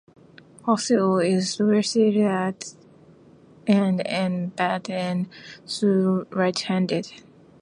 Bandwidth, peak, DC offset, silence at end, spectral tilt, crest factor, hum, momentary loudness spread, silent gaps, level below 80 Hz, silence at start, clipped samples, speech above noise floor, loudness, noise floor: 11 kHz; -4 dBFS; under 0.1%; 0.45 s; -5.5 dB/octave; 18 dB; none; 12 LU; none; -68 dBFS; 0.65 s; under 0.1%; 29 dB; -23 LUFS; -51 dBFS